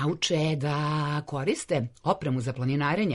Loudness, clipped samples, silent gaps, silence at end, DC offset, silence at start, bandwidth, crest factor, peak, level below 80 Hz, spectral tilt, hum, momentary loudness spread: -28 LUFS; under 0.1%; none; 0 s; under 0.1%; 0 s; 11.5 kHz; 16 dB; -10 dBFS; -60 dBFS; -5.5 dB/octave; none; 4 LU